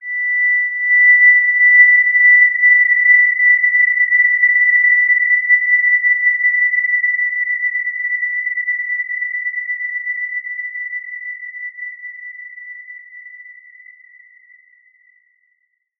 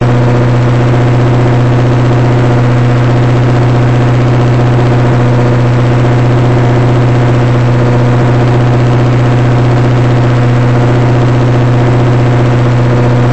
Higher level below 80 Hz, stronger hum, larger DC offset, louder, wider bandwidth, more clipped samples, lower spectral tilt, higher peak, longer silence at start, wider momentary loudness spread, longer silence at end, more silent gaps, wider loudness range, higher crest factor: second, under -90 dBFS vs -24 dBFS; neither; second, under 0.1% vs 5%; second, -11 LUFS vs -8 LUFS; second, 2.3 kHz vs 8.2 kHz; neither; second, 2 dB/octave vs -8 dB/octave; first, 0 dBFS vs -4 dBFS; about the same, 0 s vs 0 s; first, 19 LU vs 0 LU; first, 2.5 s vs 0 s; neither; first, 19 LU vs 0 LU; first, 14 dB vs 4 dB